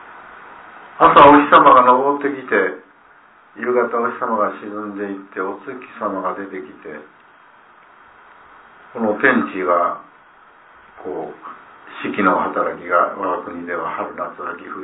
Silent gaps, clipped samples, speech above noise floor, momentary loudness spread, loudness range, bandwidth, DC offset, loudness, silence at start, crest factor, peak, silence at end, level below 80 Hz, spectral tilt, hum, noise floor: none; under 0.1%; 32 dB; 24 LU; 16 LU; 4 kHz; under 0.1%; -16 LUFS; 0.05 s; 18 dB; 0 dBFS; 0 s; -56 dBFS; -8.5 dB/octave; none; -49 dBFS